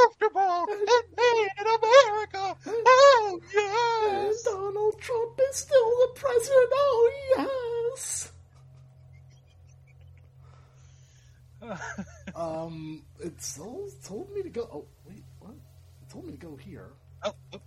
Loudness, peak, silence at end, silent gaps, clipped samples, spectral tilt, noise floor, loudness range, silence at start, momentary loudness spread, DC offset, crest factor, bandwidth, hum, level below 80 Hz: -24 LUFS; -4 dBFS; 0.1 s; none; under 0.1%; -3 dB/octave; -55 dBFS; 20 LU; 0 s; 22 LU; under 0.1%; 22 dB; 13.5 kHz; none; -64 dBFS